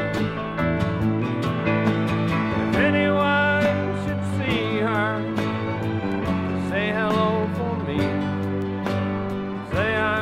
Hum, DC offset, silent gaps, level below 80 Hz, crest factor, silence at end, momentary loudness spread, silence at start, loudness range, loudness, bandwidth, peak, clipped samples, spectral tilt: none; under 0.1%; none; -46 dBFS; 16 dB; 0 s; 7 LU; 0 s; 3 LU; -23 LUFS; 14 kHz; -6 dBFS; under 0.1%; -7.5 dB/octave